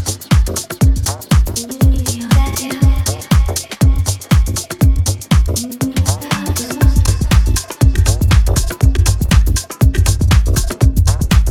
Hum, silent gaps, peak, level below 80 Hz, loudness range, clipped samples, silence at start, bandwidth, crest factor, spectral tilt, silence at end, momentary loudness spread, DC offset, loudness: none; none; 0 dBFS; -16 dBFS; 2 LU; under 0.1%; 0 s; 17.5 kHz; 12 dB; -5 dB/octave; 0 s; 5 LU; under 0.1%; -15 LUFS